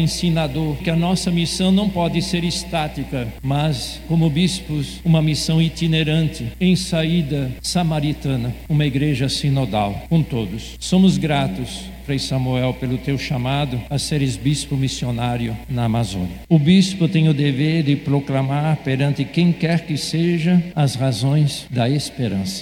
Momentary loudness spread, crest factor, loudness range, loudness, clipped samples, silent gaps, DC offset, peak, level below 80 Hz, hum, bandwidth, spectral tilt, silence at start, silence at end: 7 LU; 16 dB; 3 LU; -19 LUFS; under 0.1%; none; under 0.1%; -2 dBFS; -38 dBFS; none; 16 kHz; -6 dB/octave; 0 s; 0 s